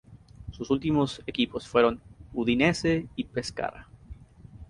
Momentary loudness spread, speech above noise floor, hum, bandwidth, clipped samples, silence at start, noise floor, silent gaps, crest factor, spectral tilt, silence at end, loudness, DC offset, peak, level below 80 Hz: 15 LU; 22 dB; none; 11.5 kHz; under 0.1%; 0.1 s; -48 dBFS; none; 20 dB; -5.5 dB/octave; 0.05 s; -27 LUFS; under 0.1%; -8 dBFS; -50 dBFS